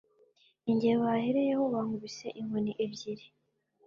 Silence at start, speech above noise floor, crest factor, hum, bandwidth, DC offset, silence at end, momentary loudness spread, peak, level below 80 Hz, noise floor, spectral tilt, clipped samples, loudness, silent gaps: 0.65 s; 40 dB; 16 dB; none; 7.4 kHz; under 0.1%; 0.6 s; 13 LU; -16 dBFS; -72 dBFS; -71 dBFS; -6.5 dB/octave; under 0.1%; -32 LUFS; none